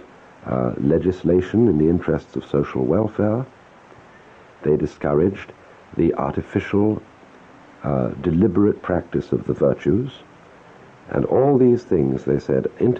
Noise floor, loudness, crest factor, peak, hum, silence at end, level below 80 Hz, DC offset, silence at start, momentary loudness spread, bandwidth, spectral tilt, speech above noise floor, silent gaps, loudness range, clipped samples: -46 dBFS; -20 LUFS; 14 dB; -6 dBFS; none; 0 s; -44 dBFS; under 0.1%; 0.45 s; 10 LU; 7.4 kHz; -9.5 dB/octave; 27 dB; none; 3 LU; under 0.1%